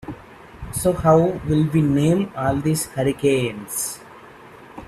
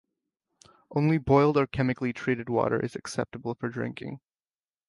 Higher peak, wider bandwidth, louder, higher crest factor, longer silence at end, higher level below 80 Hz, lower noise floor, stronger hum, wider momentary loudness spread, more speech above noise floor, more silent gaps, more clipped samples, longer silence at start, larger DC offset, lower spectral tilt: first, -2 dBFS vs -8 dBFS; first, 15.5 kHz vs 11.5 kHz; first, -20 LUFS vs -27 LUFS; about the same, 18 dB vs 22 dB; second, 0.05 s vs 0.7 s; first, -44 dBFS vs -54 dBFS; second, -43 dBFS vs under -90 dBFS; neither; first, 21 LU vs 13 LU; second, 24 dB vs over 63 dB; neither; neither; second, 0.05 s vs 0.9 s; neither; about the same, -6 dB/octave vs -7 dB/octave